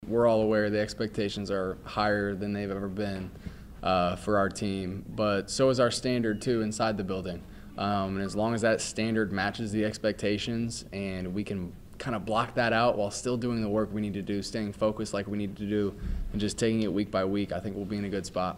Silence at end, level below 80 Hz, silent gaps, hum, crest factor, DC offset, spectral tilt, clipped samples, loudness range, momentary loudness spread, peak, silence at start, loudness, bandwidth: 0 s; -48 dBFS; none; none; 18 dB; under 0.1%; -5.5 dB/octave; under 0.1%; 3 LU; 9 LU; -12 dBFS; 0 s; -30 LUFS; 15.5 kHz